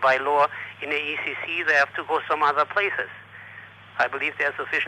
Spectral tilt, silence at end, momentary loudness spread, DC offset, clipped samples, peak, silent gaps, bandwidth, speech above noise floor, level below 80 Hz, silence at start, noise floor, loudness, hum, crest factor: -3.5 dB/octave; 0 s; 19 LU; under 0.1%; under 0.1%; -10 dBFS; none; 15.5 kHz; 20 dB; -70 dBFS; 0 s; -44 dBFS; -23 LUFS; none; 16 dB